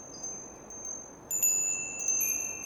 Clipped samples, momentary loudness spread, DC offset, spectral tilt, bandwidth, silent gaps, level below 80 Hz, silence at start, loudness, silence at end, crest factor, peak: under 0.1%; 16 LU; under 0.1%; -0.5 dB/octave; over 20 kHz; none; -64 dBFS; 0 s; -29 LUFS; 0 s; 18 dB; -16 dBFS